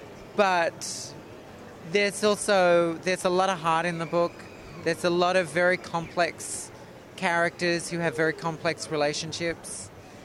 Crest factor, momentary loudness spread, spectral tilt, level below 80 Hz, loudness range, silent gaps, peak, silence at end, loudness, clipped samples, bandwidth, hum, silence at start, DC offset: 18 dB; 18 LU; -4 dB/octave; -60 dBFS; 3 LU; none; -8 dBFS; 0 s; -26 LUFS; under 0.1%; 15 kHz; none; 0 s; under 0.1%